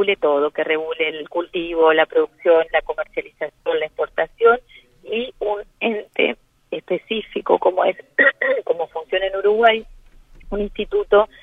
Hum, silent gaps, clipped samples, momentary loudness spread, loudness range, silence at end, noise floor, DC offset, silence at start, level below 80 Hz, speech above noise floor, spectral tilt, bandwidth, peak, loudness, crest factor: none; none; under 0.1%; 11 LU; 4 LU; 0.15 s; -46 dBFS; under 0.1%; 0 s; -46 dBFS; 27 dB; -6 dB/octave; 3.9 kHz; 0 dBFS; -20 LUFS; 18 dB